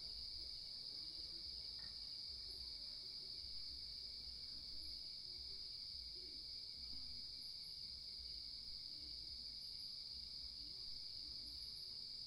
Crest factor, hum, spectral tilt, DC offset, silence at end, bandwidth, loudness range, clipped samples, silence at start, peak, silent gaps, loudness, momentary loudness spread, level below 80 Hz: 14 dB; none; -1.5 dB/octave; under 0.1%; 0 s; 15.5 kHz; 1 LU; under 0.1%; 0 s; -38 dBFS; none; -49 LUFS; 1 LU; -66 dBFS